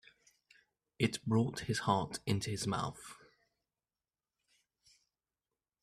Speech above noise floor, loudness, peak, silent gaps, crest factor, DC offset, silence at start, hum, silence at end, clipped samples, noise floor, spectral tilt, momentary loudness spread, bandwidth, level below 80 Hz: over 55 dB; -36 LUFS; -16 dBFS; none; 24 dB; under 0.1%; 1 s; none; 2.7 s; under 0.1%; under -90 dBFS; -5 dB/octave; 8 LU; 14.5 kHz; -68 dBFS